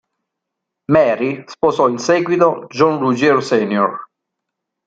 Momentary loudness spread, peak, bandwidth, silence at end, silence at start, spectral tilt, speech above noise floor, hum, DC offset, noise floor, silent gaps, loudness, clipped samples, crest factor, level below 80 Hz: 7 LU; -2 dBFS; 9 kHz; 0.8 s; 0.9 s; -6 dB/octave; 64 dB; none; under 0.1%; -79 dBFS; none; -15 LUFS; under 0.1%; 16 dB; -58 dBFS